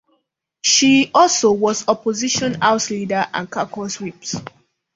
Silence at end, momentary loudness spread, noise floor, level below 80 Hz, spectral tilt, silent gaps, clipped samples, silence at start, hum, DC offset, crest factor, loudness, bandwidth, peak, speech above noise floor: 0.45 s; 14 LU; -69 dBFS; -58 dBFS; -2.5 dB/octave; none; under 0.1%; 0.65 s; none; under 0.1%; 18 dB; -17 LUFS; 7.8 kHz; 0 dBFS; 52 dB